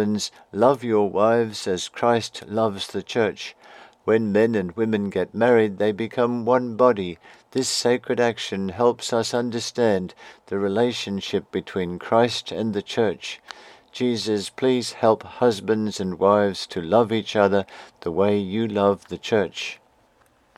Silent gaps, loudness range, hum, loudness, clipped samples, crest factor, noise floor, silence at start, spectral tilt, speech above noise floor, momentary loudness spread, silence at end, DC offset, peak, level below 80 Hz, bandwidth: none; 3 LU; none; -22 LUFS; under 0.1%; 20 dB; -60 dBFS; 0 s; -5 dB/octave; 38 dB; 10 LU; 0.85 s; under 0.1%; -2 dBFS; -64 dBFS; 14 kHz